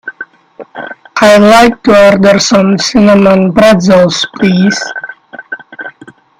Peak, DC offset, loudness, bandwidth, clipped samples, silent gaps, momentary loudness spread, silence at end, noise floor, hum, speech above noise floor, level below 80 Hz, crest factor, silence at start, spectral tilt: 0 dBFS; under 0.1%; -6 LUFS; 15 kHz; 2%; none; 21 LU; 0.5 s; -36 dBFS; none; 30 dB; -40 dBFS; 8 dB; 0.05 s; -5 dB/octave